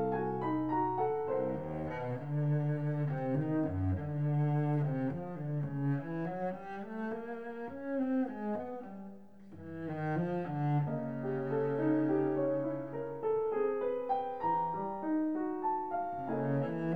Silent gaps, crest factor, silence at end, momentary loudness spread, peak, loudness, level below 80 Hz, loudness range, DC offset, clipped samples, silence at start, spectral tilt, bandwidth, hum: none; 14 dB; 0 s; 10 LU; -22 dBFS; -35 LUFS; -66 dBFS; 5 LU; 0.2%; under 0.1%; 0 s; -11 dB/octave; 4.3 kHz; none